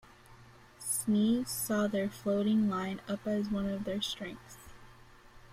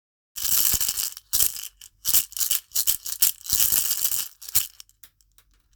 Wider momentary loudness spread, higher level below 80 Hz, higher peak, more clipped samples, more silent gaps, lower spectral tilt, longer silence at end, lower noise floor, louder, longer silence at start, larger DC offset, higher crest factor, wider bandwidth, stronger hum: first, 13 LU vs 10 LU; second, -60 dBFS vs -52 dBFS; second, -20 dBFS vs 0 dBFS; neither; neither; first, -4.5 dB/octave vs 1.5 dB/octave; second, 0 s vs 1.05 s; second, -56 dBFS vs -61 dBFS; second, -32 LUFS vs -21 LUFS; about the same, 0.3 s vs 0.35 s; neither; second, 14 dB vs 26 dB; second, 16 kHz vs over 20 kHz; neither